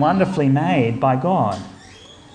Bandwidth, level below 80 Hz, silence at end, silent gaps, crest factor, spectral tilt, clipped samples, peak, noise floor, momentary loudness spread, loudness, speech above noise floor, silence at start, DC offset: 9.8 kHz; -54 dBFS; 0.3 s; none; 14 dB; -8 dB/octave; under 0.1%; -4 dBFS; -43 dBFS; 9 LU; -18 LUFS; 25 dB; 0 s; under 0.1%